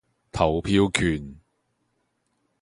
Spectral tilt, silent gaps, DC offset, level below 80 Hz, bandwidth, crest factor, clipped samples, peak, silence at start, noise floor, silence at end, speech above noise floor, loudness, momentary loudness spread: -5.5 dB/octave; none; under 0.1%; -42 dBFS; 11.5 kHz; 24 dB; under 0.1%; -2 dBFS; 0.35 s; -73 dBFS; 1.25 s; 50 dB; -23 LUFS; 15 LU